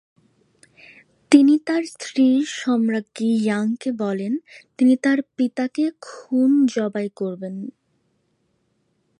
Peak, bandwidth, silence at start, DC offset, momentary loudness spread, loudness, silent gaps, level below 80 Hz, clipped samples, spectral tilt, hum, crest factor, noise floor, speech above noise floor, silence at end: -2 dBFS; 11 kHz; 1.3 s; under 0.1%; 12 LU; -20 LUFS; none; -74 dBFS; under 0.1%; -5.5 dB/octave; none; 20 dB; -68 dBFS; 48 dB; 1.5 s